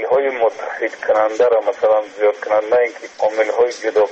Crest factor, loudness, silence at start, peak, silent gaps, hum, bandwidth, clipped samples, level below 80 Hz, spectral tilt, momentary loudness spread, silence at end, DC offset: 12 dB; -17 LUFS; 0 s; -4 dBFS; none; none; 8.2 kHz; under 0.1%; -62 dBFS; -3 dB/octave; 6 LU; 0 s; under 0.1%